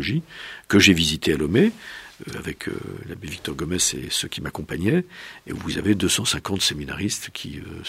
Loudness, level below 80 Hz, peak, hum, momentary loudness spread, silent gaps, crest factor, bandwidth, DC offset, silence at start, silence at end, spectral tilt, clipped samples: -22 LUFS; -46 dBFS; 0 dBFS; none; 17 LU; none; 22 dB; 16 kHz; under 0.1%; 0 s; 0 s; -3.5 dB/octave; under 0.1%